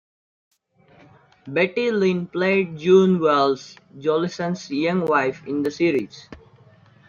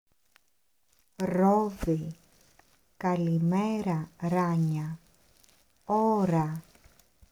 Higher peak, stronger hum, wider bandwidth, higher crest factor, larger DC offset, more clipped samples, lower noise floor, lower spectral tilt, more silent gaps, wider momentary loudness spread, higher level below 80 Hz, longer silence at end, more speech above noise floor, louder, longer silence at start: first, -4 dBFS vs -14 dBFS; neither; second, 7.2 kHz vs 14.5 kHz; about the same, 18 dB vs 16 dB; neither; neither; second, -55 dBFS vs -75 dBFS; second, -6.5 dB/octave vs -8.5 dB/octave; neither; about the same, 11 LU vs 12 LU; second, -64 dBFS vs -54 dBFS; about the same, 0.75 s vs 0.7 s; second, 35 dB vs 48 dB; first, -21 LUFS vs -28 LUFS; first, 1.45 s vs 1.2 s